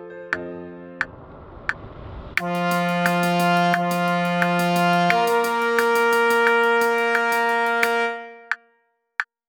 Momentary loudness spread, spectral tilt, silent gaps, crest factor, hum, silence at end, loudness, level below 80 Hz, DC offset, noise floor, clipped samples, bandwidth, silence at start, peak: 12 LU; -5 dB/octave; none; 20 dB; none; 0.25 s; -21 LUFS; -52 dBFS; under 0.1%; -66 dBFS; under 0.1%; over 20 kHz; 0 s; -2 dBFS